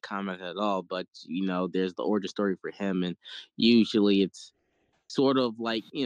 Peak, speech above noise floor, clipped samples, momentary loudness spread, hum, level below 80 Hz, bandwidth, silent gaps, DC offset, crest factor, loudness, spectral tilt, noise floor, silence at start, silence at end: -10 dBFS; 45 dB; under 0.1%; 14 LU; none; -70 dBFS; 9.4 kHz; none; under 0.1%; 18 dB; -28 LUFS; -6 dB/octave; -73 dBFS; 0.05 s; 0 s